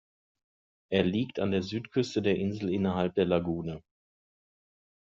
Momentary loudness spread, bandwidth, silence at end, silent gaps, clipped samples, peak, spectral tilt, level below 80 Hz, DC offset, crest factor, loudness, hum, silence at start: 6 LU; 7.4 kHz; 1.25 s; none; under 0.1%; -10 dBFS; -6 dB/octave; -64 dBFS; under 0.1%; 20 dB; -30 LUFS; none; 0.9 s